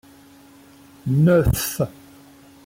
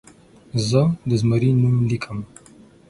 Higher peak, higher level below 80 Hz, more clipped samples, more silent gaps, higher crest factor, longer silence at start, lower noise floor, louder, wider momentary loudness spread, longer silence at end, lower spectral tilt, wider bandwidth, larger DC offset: second, -8 dBFS vs -4 dBFS; first, -38 dBFS vs -50 dBFS; neither; neither; about the same, 16 dB vs 18 dB; first, 1.05 s vs 0.55 s; about the same, -48 dBFS vs -48 dBFS; about the same, -20 LUFS vs -20 LUFS; about the same, 12 LU vs 13 LU; about the same, 0.75 s vs 0.65 s; about the same, -6.5 dB/octave vs -7 dB/octave; first, 16.5 kHz vs 11.5 kHz; neither